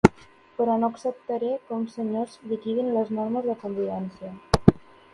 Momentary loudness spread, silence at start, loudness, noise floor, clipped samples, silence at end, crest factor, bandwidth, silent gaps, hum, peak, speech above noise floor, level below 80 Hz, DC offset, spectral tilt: 12 LU; 0.05 s; -26 LUFS; -49 dBFS; under 0.1%; 0.35 s; 26 dB; 11.5 kHz; none; none; 0 dBFS; 21 dB; -44 dBFS; under 0.1%; -7.5 dB/octave